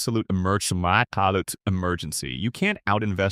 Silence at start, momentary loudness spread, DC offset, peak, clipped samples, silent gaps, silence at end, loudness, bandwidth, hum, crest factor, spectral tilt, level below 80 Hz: 0 s; 6 LU; under 0.1%; -4 dBFS; under 0.1%; none; 0 s; -24 LUFS; 15.5 kHz; none; 20 dB; -4.5 dB/octave; -48 dBFS